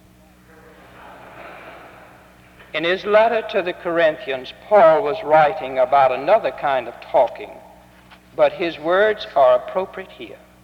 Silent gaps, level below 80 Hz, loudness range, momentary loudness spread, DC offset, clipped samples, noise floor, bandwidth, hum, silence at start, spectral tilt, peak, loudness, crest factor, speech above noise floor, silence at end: none; -56 dBFS; 6 LU; 22 LU; under 0.1%; under 0.1%; -49 dBFS; 6.4 kHz; none; 1 s; -5.5 dB/octave; -4 dBFS; -18 LUFS; 16 dB; 32 dB; 0.3 s